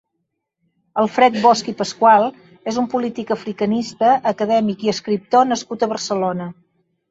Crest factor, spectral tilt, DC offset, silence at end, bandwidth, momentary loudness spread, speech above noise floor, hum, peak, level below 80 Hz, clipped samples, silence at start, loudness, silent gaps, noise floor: 16 dB; -5 dB/octave; under 0.1%; 0.6 s; 8 kHz; 11 LU; 58 dB; none; -2 dBFS; -62 dBFS; under 0.1%; 0.95 s; -18 LUFS; none; -75 dBFS